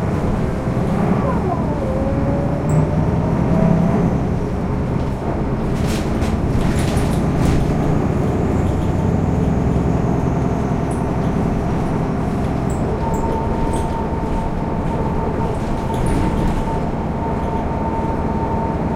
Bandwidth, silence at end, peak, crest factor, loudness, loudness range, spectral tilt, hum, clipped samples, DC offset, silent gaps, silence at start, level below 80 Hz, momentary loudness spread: 15 kHz; 0 s; -2 dBFS; 16 dB; -19 LUFS; 3 LU; -8 dB/octave; none; under 0.1%; under 0.1%; none; 0 s; -26 dBFS; 4 LU